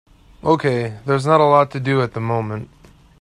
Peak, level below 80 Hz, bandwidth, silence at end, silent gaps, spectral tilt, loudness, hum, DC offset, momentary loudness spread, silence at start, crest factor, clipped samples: 0 dBFS; -52 dBFS; 11 kHz; 0.55 s; none; -7.5 dB/octave; -18 LUFS; none; under 0.1%; 11 LU; 0.45 s; 18 dB; under 0.1%